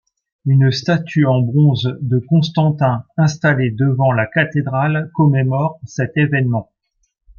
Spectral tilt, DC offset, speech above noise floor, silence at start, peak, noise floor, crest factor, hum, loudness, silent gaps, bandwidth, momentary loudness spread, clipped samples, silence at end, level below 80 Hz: -7.5 dB/octave; under 0.1%; 53 dB; 0.45 s; -2 dBFS; -68 dBFS; 14 dB; none; -16 LUFS; none; 7 kHz; 6 LU; under 0.1%; 0.75 s; -54 dBFS